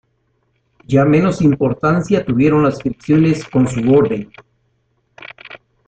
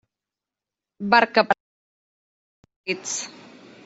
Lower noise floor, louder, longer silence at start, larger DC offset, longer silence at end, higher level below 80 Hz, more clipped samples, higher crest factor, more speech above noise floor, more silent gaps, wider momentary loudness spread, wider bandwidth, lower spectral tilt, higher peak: second, -63 dBFS vs -89 dBFS; first, -15 LUFS vs -22 LUFS; about the same, 0.9 s vs 1 s; neither; second, 0.3 s vs 0.55 s; first, -46 dBFS vs -72 dBFS; neither; second, 14 dB vs 24 dB; second, 50 dB vs 68 dB; second, none vs 1.60-2.63 s, 2.76-2.84 s; first, 21 LU vs 17 LU; first, 9.2 kHz vs 8.2 kHz; first, -8 dB/octave vs -2.5 dB/octave; about the same, -2 dBFS vs -2 dBFS